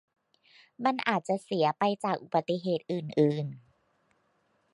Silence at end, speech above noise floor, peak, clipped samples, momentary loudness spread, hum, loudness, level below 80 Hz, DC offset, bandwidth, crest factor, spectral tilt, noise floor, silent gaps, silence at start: 1.15 s; 43 dB; -10 dBFS; under 0.1%; 5 LU; none; -30 LUFS; -78 dBFS; under 0.1%; 11.5 kHz; 22 dB; -6.5 dB/octave; -72 dBFS; none; 0.8 s